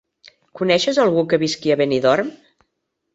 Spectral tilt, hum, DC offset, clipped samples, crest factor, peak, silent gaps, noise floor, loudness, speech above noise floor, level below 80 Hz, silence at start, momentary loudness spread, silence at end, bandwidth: -5 dB/octave; none; under 0.1%; under 0.1%; 16 dB; -2 dBFS; none; -75 dBFS; -18 LUFS; 57 dB; -60 dBFS; 0.55 s; 5 LU; 0.8 s; 8 kHz